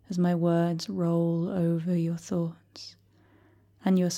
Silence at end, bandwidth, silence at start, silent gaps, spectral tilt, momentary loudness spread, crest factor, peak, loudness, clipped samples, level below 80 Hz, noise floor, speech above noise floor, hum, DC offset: 0 s; 9.2 kHz; 0.1 s; none; -7 dB/octave; 18 LU; 14 dB; -14 dBFS; -28 LUFS; under 0.1%; -70 dBFS; -60 dBFS; 34 dB; none; under 0.1%